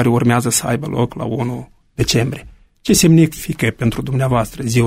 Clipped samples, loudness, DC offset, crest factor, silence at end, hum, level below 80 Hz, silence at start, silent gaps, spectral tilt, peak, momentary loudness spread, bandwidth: under 0.1%; -16 LUFS; under 0.1%; 14 dB; 0 s; none; -38 dBFS; 0 s; none; -5 dB/octave; -2 dBFS; 12 LU; 16 kHz